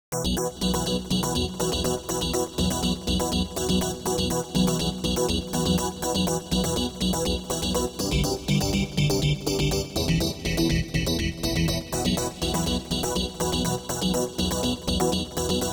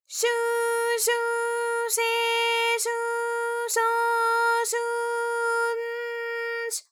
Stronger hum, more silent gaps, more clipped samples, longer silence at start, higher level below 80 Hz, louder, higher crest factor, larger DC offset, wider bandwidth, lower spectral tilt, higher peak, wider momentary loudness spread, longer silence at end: neither; neither; neither; about the same, 0.1 s vs 0.1 s; first, -36 dBFS vs under -90 dBFS; about the same, -25 LUFS vs -25 LUFS; about the same, 16 dB vs 14 dB; neither; about the same, over 20 kHz vs 20 kHz; first, -4.5 dB/octave vs 5 dB/octave; about the same, -10 dBFS vs -12 dBFS; second, 2 LU vs 7 LU; about the same, 0 s vs 0.1 s